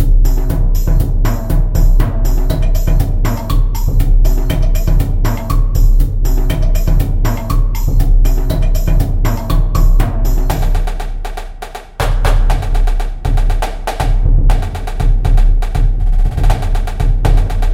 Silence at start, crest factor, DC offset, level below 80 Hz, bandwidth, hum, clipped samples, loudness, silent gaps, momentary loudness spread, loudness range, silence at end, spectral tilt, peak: 0 s; 10 dB; under 0.1%; -10 dBFS; 15.5 kHz; none; under 0.1%; -16 LUFS; none; 5 LU; 2 LU; 0 s; -6.5 dB/octave; 0 dBFS